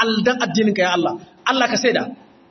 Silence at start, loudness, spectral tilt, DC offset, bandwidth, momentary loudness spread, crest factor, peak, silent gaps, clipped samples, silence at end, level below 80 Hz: 0 s; -18 LUFS; -4 dB/octave; under 0.1%; 6.4 kHz; 8 LU; 18 dB; -2 dBFS; none; under 0.1%; 0.35 s; -64 dBFS